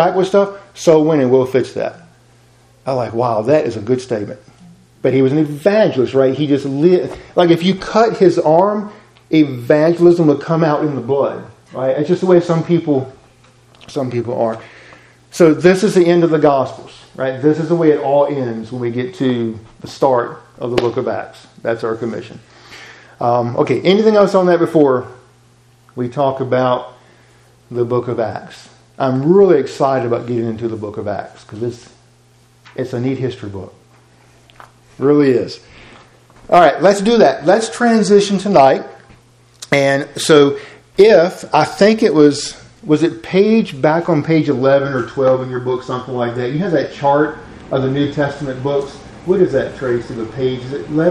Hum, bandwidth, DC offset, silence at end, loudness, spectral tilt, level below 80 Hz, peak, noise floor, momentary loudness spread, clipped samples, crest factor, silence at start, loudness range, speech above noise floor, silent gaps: none; 12.5 kHz; under 0.1%; 0 s; -15 LUFS; -6.5 dB/octave; -52 dBFS; 0 dBFS; -50 dBFS; 14 LU; under 0.1%; 14 dB; 0 s; 7 LU; 36 dB; none